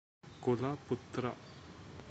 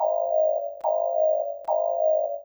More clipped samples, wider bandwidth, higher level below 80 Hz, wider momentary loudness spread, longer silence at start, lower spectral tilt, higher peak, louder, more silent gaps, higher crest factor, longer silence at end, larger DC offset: neither; second, 8.2 kHz vs over 20 kHz; first, -68 dBFS vs -74 dBFS; first, 17 LU vs 4 LU; first, 0.25 s vs 0 s; about the same, -7.5 dB/octave vs -6.5 dB/octave; second, -20 dBFS vs -12 dBFS; second, -38 LUFS vs -24 LUFS; neither; first, 20 dB vs 12 dB; about the same, 0 s vs 0 s; neither